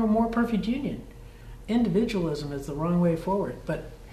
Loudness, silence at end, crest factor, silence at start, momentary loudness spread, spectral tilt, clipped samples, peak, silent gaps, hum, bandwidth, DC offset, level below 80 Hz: -27 LUFS; 0 s; 14 dB; 0 s; 17 LU; -7.5 dB/octave; under 0.1%; -12 dBFS; none; none; 13.5 kHz; under 0.1%; -44 dBFS